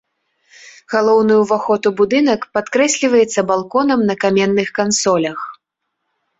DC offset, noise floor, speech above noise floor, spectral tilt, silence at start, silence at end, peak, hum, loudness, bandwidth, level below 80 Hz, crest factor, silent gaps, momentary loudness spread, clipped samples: under 0.1%; -75 dBFS; 60 dB; -4 dB/octave; 0.65 s; 0.85 s; -2 dBFS; none; -15 LUFS; 8.2 kHz; -58 dBFS; 14 dB; none; 6 LU; under 0.1%